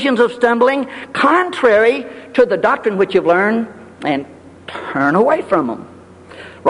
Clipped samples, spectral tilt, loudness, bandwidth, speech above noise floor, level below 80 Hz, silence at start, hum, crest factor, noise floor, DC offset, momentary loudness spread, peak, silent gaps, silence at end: under 0.1%; -6 dB/octave; -15 LUFS; 11 kHz; 23 dB; -54 dBFS; 0 s; none; 16 dB; -38 dBFS; under 0.1%; 16 LU; 0 dBFS; none; 0 s